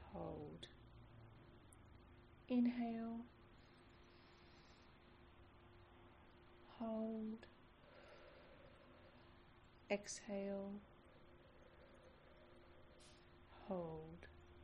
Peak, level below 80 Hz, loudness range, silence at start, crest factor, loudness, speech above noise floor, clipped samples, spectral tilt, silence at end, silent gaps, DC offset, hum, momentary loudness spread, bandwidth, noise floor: -28 dBFS; -72 dBFS; 11 LU; 0 s; 24 dB; -47 LUFS; 21 dB; under 0.1%; -5.5 dB/octave; 0 s; none; under 0.1%; none; 21 LU; 5.8 kHz; -67 dBFS